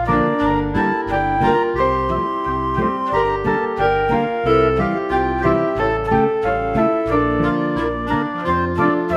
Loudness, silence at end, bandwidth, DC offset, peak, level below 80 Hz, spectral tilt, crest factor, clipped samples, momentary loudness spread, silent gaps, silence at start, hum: -18 LUFS; 0 s; 9 kHz; under 0.1%; -2 dBFS; -34 dBFS; -8 dB/octave; 16 dB; under 0.1%; 4 LU; none; 0 s; none